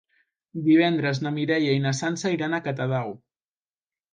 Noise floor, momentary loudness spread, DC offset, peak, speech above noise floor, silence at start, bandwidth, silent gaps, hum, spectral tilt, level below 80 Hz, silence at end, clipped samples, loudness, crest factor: under -90 dBFS; 11 LU; under 0.1%; -8 dBFS; over 67 dB; 0.55 s; 9.4 kHz; none; none; -6 dB/octave; -68 dBFS; 1 s; under 0.1%; -24 LUFS; 16 dB